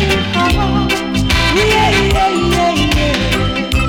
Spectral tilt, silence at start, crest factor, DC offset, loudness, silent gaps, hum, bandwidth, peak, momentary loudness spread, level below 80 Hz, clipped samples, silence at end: -4.5 dB/octave; 0 s; 6 dB; under 0.1%; -13 LUFS; none; none; 18 kHz; -6 dBFS; 4 LU; -20 dBFS; under 0.1%; 0 s